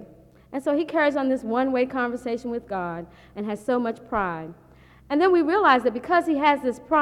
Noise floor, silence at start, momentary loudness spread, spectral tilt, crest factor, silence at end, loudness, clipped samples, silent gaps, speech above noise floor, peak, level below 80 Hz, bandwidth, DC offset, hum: -50 dBFS; 0 s; 14 LU; -6 dB/octave; 20 dB; 0 s; -23 LUFS; under 0.1%; none; 27 dB; -4 dBFS; -56 dBFS; 12.5 kHz; under 0.1%; none